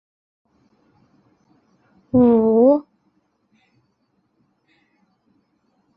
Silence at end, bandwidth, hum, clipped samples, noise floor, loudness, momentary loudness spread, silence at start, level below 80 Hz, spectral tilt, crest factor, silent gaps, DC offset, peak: 3.15 s; 2.8 kHz; none; under 0.1%; -68 dBFS; -16 LUFS; 7 LU; 2.15 s; -56 dBFS; -12.5 dB/octave; 18 dB; none; under 0.1%; -4 dBFS